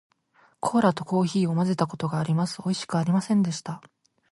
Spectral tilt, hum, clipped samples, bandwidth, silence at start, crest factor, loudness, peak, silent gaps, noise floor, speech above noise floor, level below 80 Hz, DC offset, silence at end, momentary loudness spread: -6.5 dB/octave; none; under 0.1%; 11.5 kHz; 0.65 s; 18 dB; -25 LUFS; -8 dBFS; none; -62 dBFS; 38 dB; -66 dBFS; under 0.1%; 0.55 s; 8 LU